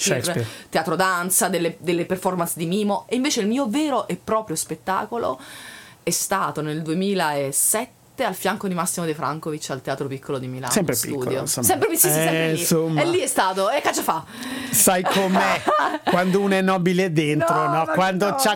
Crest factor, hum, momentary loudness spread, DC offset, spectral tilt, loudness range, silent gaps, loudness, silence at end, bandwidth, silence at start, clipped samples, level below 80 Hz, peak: 18 dB; none; 9 LU; under 0.1%; -3.5 dB/octave; 5 LU; none; -21 LUFS; 0 s; 19 kHz; 0 s; under 0.1%; -60 dBFS; -4 dBFS